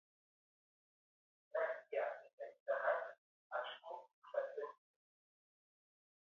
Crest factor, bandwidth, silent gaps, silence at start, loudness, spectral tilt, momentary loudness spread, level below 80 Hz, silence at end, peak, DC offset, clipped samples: 24 dB; 6.6 kHz; 2.33-2.38 s, 2.60-2.66 s, 3.18-3.50 s, 4.13-4.22 s; 1.55 s; -44 LUFS; 2.5 dB/octave; 13 LU; under -90 dBFS; 1.65 s; -24 dBFS; under 0.1%; under 0.1%